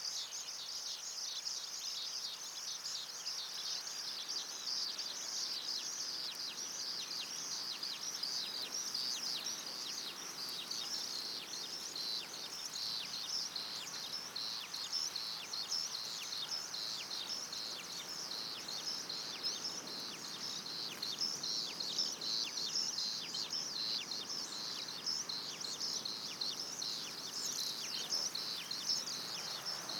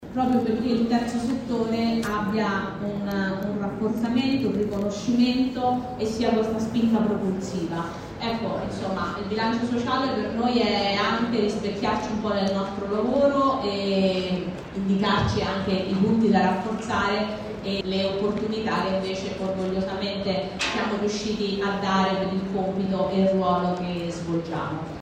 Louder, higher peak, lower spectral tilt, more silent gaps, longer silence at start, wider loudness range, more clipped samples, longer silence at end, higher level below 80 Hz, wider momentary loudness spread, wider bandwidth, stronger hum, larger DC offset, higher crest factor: second, -39 LUFS vs -25 LUFS; second, -24 dBFS vs -8 dBFS; second, 0.5 dB/octave vs -6 dB/octave; neither; about the same, 0 s vs 0 s; about the same, 3 LU vs 3 LU; neither; about the same, 0 s vs 0 s; second, -88 dBFS vs -48 dBFS; about the same, 5 LU vs 7 LU; first, over 20 kHz vs 14.5 kHz; neither; neither; about the same, 18 dB vs 18 dB